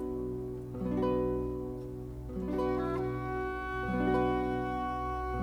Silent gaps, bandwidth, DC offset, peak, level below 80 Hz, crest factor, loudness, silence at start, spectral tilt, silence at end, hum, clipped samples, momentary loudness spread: none; 14 kHz; under 0.1%; -18 dBFS; -44 dBFS; 14 dB; -34 LUFS; 0 s; -8.5 dB/octave; 0 s; none; under 0.1%; 10 LU